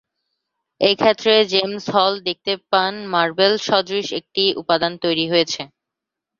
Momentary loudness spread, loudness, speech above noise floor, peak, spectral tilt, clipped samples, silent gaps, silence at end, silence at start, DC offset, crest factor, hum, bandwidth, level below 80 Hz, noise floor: 8 LU; -18 LUFS; 65 dB; 0 dBFS; -4 dB/octave; under 0.1%; none; 0.75 s; 0.8 s; under 0.1%; 20 dB; none; 7.6 kHz; -64 dBFS; -84 dBFS